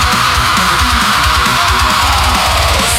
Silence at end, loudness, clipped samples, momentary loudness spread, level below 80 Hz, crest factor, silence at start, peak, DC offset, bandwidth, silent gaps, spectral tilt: 0 s; -10 LUFS; under 0.1%; 1 LU; -20 dBFS; 10 dB; 0 s; 0 dBFS; 0.4%; 17 kHz; none; -2.5 dB/octave